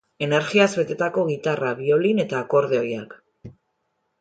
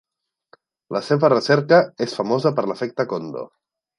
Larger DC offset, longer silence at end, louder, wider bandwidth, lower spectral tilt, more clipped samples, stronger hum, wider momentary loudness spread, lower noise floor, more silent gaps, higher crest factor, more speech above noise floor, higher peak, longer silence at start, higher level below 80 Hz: neither; first, 0.7 s vs 0.5 s; about the same, -21 LUFS vs -20 LUFS; second, 9.2 kHz vs 11 kHz; about the same, -5.5 dB/octave vs -6.5 dB/octave; neither; neither; second, 6 LU vs 14 LU; first, -74 dBFS vs -57 dBFS; neither; about the same, 20 dB vs 20 dB; first, 52 dB vs 38 dB; about the same, -2 dBFS vs -2 dBFS; second, 0.2 s vs 0.9 s; first, -64 dBFS vs -70 dBFS